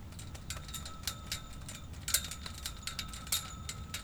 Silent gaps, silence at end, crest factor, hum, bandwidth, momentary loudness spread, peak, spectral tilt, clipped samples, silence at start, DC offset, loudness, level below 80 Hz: none; 0 s; 30 dB; none; over 20 kHz; 13 LU; -12 dBFS; -1.5 dB/octave; under 0.1%; 0 s; under 0.1%; -39 LUFS; -50 dBFS